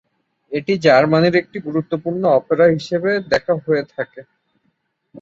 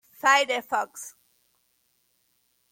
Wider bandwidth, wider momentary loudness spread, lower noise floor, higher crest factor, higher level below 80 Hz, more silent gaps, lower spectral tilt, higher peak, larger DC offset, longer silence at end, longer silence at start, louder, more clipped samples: second, 7.6 kHz vs 17 kHz; second, 13 LU vs 21 LU; about the same, -68 dBFS vs -70 dBFS; second, 16 dB vs 22 dB; first, -58 dBFS vs -82 dBFS; neither; first, -7 dB/octave vs 0.5 dB/octave; first, -2 dBFS vs -6 dBFS; neither; second, 0 s vs 1.6 s; first, 0.5 s vs 0.25 s; first, -17 LUFS vs -24 LUFS; neither